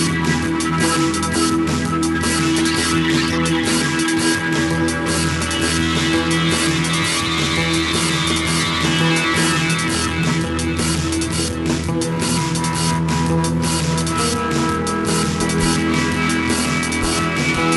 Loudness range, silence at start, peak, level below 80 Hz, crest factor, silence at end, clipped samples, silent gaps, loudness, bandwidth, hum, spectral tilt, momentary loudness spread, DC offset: 2 LU; 0 s; -4 dBFS; -36 dBFS; 14 dB; 0 s; under 0.1%; none; -18 LUFS; 12 kHz; none; -4 dB/octave; 3 LU; under 0.1%